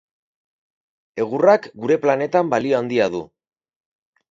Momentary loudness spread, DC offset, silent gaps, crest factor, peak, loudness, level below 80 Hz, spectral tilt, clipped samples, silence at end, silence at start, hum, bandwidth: 10 LU; under 0.1%; none; 20 dB; 0 dBFS; -19 LUFS; -64 dBFS; -6.5 dB/octave; under 0.1%; 1.05 s; 1.15 s; none; 7.6 kHz